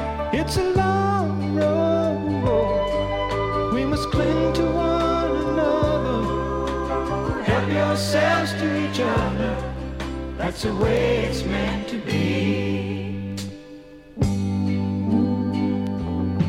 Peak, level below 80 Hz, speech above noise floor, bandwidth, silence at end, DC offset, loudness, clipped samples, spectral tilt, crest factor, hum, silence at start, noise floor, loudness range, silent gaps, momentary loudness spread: -6 dBFS; -36 dBFS; 21 dB; 16 kHz; 0 s; under 0.1%; -23 LUFS; under 0.1%; -6.5 dB/octave; 16 dB; none; 0 s; -42 dBFS; 3 LU; none; 8 LU